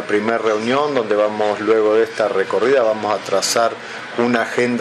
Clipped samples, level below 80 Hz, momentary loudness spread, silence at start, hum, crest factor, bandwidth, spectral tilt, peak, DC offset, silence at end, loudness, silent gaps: under 0.1%; -66 dBFS; 5 LU; 0 s; none; 16 dB; 13 kHz; -3.5 dB/octave; 0 dBFS; under 0.1%; 0 s; -17 LUFS; none